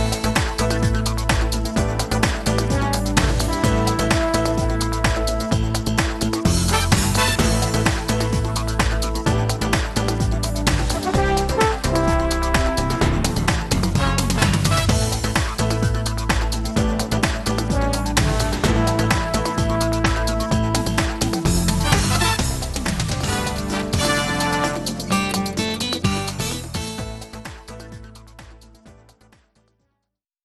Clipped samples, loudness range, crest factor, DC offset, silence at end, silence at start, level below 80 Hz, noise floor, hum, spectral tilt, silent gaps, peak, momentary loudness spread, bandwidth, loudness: under 0.1%; 4 LU; 16 dB; under 0.1%; 1.5 s; 0 s; -26 dBFS; -78 dBFS; none; -4.5 dB/octave; none; -4 dBFS; 5 LU; 12.5 kHz; -20 LUFS